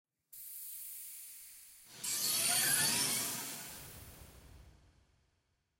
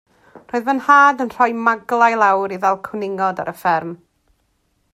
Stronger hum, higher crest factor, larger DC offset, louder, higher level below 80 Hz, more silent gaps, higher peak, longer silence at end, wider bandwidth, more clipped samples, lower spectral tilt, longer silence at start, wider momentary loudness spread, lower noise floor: neither; about the same, 20 dB vs 18 dB; neither; second, -33 LUFS vs -17 LUFS; about the same, -68 dBFS vs -64 dBFS; neither; second, -20 dBFS vs 0 dBFS; about the same, 1.1 s vs 1 s; about the same, 16.5 kHz vs 15.5 kHz; neither; second, 0 dB/octave vs -5 dB/octave; about the same, 0.3 s vs 0.35 s; first, 24 LU vs 12 LU; first, -80 dBFS vs -65 dBFS